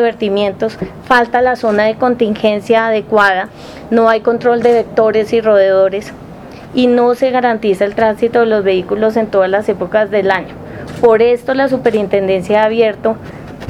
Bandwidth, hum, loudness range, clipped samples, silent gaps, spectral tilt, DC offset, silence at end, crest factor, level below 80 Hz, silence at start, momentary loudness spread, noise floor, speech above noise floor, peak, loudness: 12 kHz; none; 1 LU; under 0.1%; none; -6 dB/octave; under 0.1%; 0 s; 12 dB; -46 dBFS; 0 s; 10 LU; -31 dBFS; 19 dB; 0 dBFS; -12 LUFS